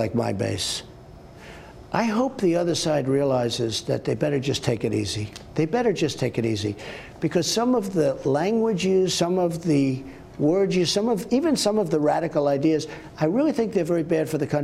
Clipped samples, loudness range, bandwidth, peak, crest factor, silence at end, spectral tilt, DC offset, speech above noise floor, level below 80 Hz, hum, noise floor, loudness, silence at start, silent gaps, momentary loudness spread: under 0.1%; 3 LU; 15.5 kHz; -6 dBFS; 18 dB; 0 s; -5.5 dB/octave; under 0.1%; 21 dB; -54 dBFS; none; -44 dBFS; -23 LUFS; 0 s; none; 8 LU